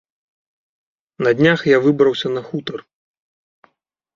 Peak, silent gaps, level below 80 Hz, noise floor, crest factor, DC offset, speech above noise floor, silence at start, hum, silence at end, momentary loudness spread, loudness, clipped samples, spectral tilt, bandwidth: -2 dBFS; none; -62 dBFS; -68 dBFS; 18 dB; under 0.1%; 52 dB; 1.2 s; none; 1.35 s; 14 LU; -16 LUFS; under 0.1%; -6.5 dB/octave; 7.4 kHz